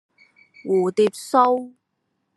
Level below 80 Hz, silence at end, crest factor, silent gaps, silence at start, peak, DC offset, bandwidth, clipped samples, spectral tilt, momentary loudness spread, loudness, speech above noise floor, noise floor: -76 dBFS; 0.7 s; 20 dB; none; 0.65 s; -4 dBFS; under 0.1%; 12.5 kHz; under 0.1%; -5.5 dB/octave; 16 LU; -20 LUFS; 55 dB; -74 dBFS